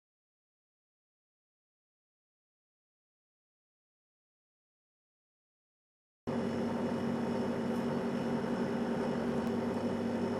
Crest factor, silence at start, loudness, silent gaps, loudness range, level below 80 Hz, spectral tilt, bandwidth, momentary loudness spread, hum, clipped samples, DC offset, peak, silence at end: 16 dB; 6.25 s; -35 LUFS; none; 9 LU; -66 dBFS; -7 dB/octave; 12.5 kHz; 1 LU; none; under 0.1%; under 0.1%; -22 dBFS; 0 s